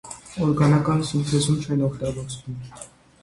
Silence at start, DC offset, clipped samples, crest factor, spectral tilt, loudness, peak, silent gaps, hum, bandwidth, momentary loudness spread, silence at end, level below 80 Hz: 0.05 s; under 0.1%; under 0.1%; 16 dB; -6 dB/octave; -22 LUFS; -6 dBFS; none; none; 11.5 kHz; 18 LU; 0.35 s; -48 dBFS